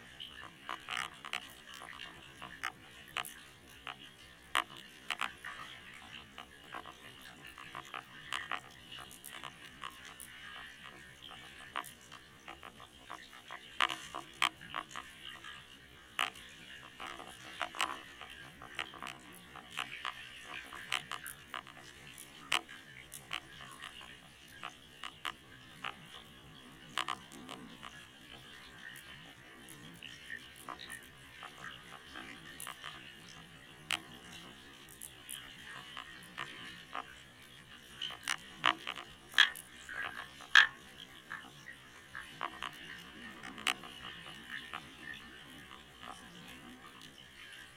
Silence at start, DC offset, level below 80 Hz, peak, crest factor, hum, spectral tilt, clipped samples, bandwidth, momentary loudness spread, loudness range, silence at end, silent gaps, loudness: 0 s; under 0.1%; -70 dBFS; -8 dBFS; 34 dB; none; -1 dB/octave; under 0.1%; 16.5 kHz; 16 LU; 15 LU; 0 s; none; -40 LUFS